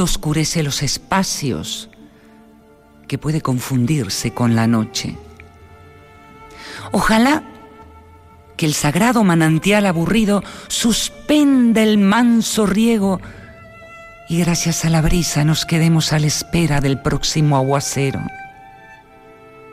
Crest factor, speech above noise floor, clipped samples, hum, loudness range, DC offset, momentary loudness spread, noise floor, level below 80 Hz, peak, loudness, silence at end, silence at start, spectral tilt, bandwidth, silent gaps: 14 dB; 31 dB; under 0.1%; none; 7 LU; under 0.1%; 14 LU; -47 dBFS; -36 dBFS; -4 dBFS; -17 LUFS; 0 s; 0 s; -5 dB/octave; 16 kHz; none